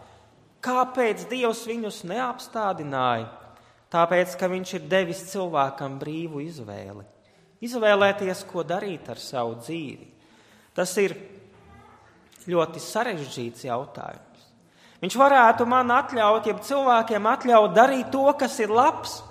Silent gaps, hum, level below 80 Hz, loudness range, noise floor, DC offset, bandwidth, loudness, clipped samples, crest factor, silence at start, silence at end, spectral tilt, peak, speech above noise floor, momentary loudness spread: none; none; -66 dBFS; 11 LU; -56 dBFS; under 0.1%; 15.5 kHz; -23 LUFS; under 0.1%; 22 dB; 0.65 s; 0 s; -4.5 dB/octave; -2 dBFS; 33 dB; 16 LU